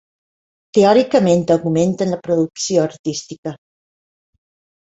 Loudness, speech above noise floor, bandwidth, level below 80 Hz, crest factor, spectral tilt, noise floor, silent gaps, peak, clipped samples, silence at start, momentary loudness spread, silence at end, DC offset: -16 LUFS; over 74 dB; 8 kHz; -56 dBFS; 18 dB; -5.5 dB/octave; under -90 dBFS; 2.99-3.04 s, 3.38-3.43 s; 0 dBFS; under 0.1%; 0.75 s; 14 LU; 1.3 s; under 0.1%